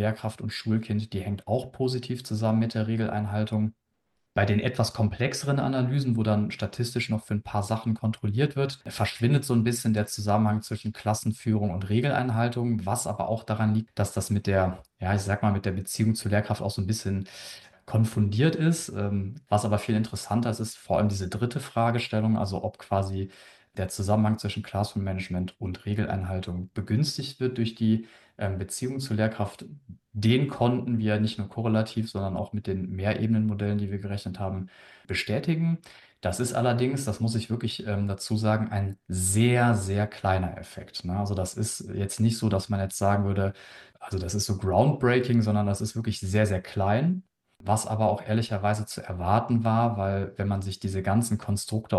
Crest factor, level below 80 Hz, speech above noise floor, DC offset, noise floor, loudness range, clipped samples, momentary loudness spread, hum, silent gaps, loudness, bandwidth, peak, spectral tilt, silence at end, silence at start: 20 dB; -58 dBFS; 50 dB; under 0.1%; -77 dBFS; 3 LU; under 0.1%; 9 LU; none; none; -27 LUFS; 12.5 kHz; -8 dBFS; -6 dB/octave; 0 s; 0 s